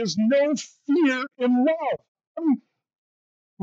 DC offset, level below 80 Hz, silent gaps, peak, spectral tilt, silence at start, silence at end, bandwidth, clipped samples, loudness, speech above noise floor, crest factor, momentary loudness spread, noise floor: under 0.1%; -78 dBFS; 2.08-2.15 s, 2.27-2.35 s, 2.95-3.57 s; -12 dBFS; -5 dB/octave; 0 s; 0 s; 8 kHz; under 0.1%; -23 LUFS; over 68 dB; 12 dB; 9 LU; under -90 dBFS